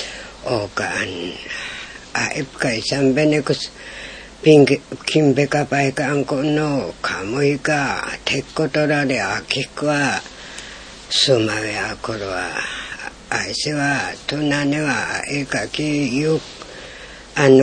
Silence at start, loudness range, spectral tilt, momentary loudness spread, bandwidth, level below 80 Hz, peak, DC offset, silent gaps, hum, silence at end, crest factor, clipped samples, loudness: 0 s; 4 LU; -4.5 dB/octave; 16 LU; 10 kHz; -48 dBFS; 0 dBFS; under 0.1%; none; none; 0 s; 18 dB; under 0.1%; -19 LUFS